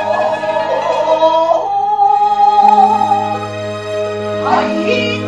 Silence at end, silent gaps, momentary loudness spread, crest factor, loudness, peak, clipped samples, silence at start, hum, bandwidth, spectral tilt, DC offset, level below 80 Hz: 0 s; none; 11 LU; 12 dB; -13 LUFS; 0 dBFS; under 0.1%; 0 s; none; 9.4 kHz; -5 dB/octave; 0.2%; -54 dBFS